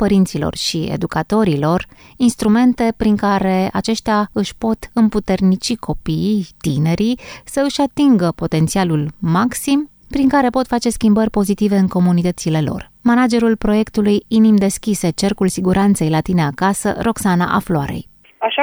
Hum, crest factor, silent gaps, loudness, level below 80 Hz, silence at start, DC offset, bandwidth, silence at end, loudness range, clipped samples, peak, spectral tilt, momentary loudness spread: none; 14 dB; none; -16 LUFS; -38 dBFS; 0 s; under 0.1%; over 20 kHz; 0 s; 2 LU; under 0.1%; -2 dBFS; -6 dB/octave; 7 LU